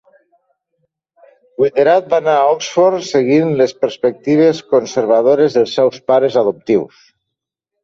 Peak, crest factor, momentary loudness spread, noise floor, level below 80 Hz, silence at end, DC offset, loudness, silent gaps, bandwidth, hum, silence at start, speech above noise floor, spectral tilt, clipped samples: -2 dBFS; 14 dB; 5 LU; -80 dBFS; -60 dBFS; 0.95 s; under 0.1%; -14 LUFS; none; 7.6 kHz; none; 1.6 s; 67 dB; -5.5 dB/octave; under 0.1%